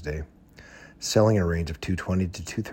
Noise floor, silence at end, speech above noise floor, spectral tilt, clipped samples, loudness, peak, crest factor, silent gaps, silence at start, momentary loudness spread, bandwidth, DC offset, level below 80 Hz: -49 dBFS; 0 s; 24 dB; -5.5 dB/octave; under 0.1%; -26 LUFS; -8 dBFS; 20 dB; none; 0 s; 14 LU; 16.5 kHz; under 0.1%; -42 dBFS